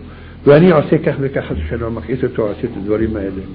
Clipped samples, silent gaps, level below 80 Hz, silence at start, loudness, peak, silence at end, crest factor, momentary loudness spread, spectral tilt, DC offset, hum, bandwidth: under 0.1%; none; -34 dBFS; 0 s; -15 LUFS; 0 dBFS; 0 s; 14 dB; 13 LU; -13 dB/octave; under 0.1%; none; 5 kHz